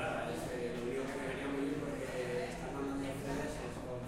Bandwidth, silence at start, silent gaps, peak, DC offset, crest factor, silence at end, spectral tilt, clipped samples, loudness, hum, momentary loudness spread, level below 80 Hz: 16 kHz; 0 s; none; -26 dBFS; under 0.1%; 12 dB; 0 s; -5.5 dB/octave; under 0.1%; -40 LUFS; none; 3 LU; -54 dBFS